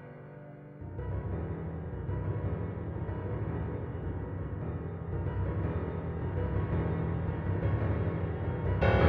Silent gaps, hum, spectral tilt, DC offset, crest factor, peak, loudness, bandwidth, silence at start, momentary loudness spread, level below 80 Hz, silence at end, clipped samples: none; none; -8 dB/octave; under 0.1%; 20 dB; -12 dBFS; -35 LUFS; 5.2 kHz; 0 s; 7 LU; -42 dBFS; 0 s; under 0.1%